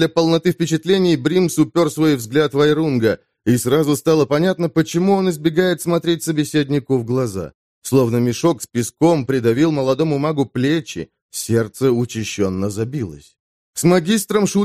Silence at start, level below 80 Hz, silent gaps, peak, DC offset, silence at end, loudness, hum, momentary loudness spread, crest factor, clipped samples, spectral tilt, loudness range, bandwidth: 0 s; -54 dBFS; 7.54-7.82 s, 11.22-11.29 s, 13.40-13.73 s; -2 dBFS; 0.1%; 0 s; -18 LUFS; none; 8 LU; 16 dB; under 0.1%; -5.5 dB/octave; 3 LU; 15.5 kHz